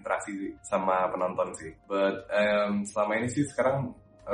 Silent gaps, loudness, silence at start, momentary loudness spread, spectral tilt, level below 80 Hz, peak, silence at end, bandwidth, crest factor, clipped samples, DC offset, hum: none; -29 LUFS; 0.05 s; 11 LU; -5.5 dB/octave; -62 dBFS; -12 dBFS; 0 s; 11 kHz; 16 dB; under 0.1%; under 0.1%; none